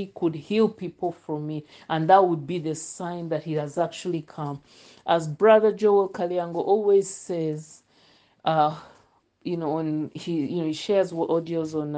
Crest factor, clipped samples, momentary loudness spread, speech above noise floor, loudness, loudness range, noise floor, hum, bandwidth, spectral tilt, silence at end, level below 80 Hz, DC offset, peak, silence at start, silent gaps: 20 dB; under 0.1%; 14 LU; 37 dB; -25 LUFS; 6 LU; -61 dBFS; none; 9.6 kHz; -6 dB/octave; 0 s; -70 dBFS; under 0.1%; -4 dBFS; 0 s; none